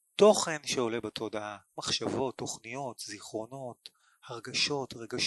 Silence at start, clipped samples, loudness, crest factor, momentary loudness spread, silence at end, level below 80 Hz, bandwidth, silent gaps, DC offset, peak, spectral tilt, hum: 0.2 s; under 0.1%; -31 LUFS; 22 dB; 17 LU; 0 s; -68 dBFS; 12.5 kHz; none; under 0.1%; -10 dBFS; -3 dB/octave; none